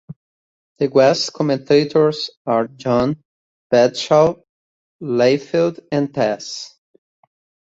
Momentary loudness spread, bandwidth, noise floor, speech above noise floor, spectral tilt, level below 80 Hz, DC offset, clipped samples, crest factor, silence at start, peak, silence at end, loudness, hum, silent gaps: 13 LU; 8 kHz; under -90 dBFS; over 73 dB; -5.5 dB/octave; -56 dBFS; under 0.1%; under 0.1%; 18 dB; 0.1 s; -2 dBFS; 1.05 s; -17 LUFS; none; 0.16-0.76 s, 2.37-2.45 s, 3.25-3.70 s, 4.49-4.99 s